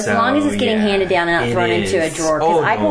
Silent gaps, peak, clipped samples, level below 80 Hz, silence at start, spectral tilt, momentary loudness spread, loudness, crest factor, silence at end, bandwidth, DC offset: none; -4 dBFS; under 0.1%; -42 dBFS; 0 s; -4.5 dB/octave; 2 LU; -16 LUFS; 12 dB; 0 s; 11 kHz; under 0.1%